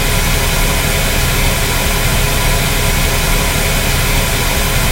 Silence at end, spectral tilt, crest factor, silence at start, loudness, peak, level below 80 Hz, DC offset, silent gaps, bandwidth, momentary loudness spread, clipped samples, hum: 0 s; -3 dB/octave; 12 dB; 0 s; -13 LUFS; 0 dBFS; -16 dBFS; under 0.1%; none; 17 kHz; 0 LU; under 0.1%; none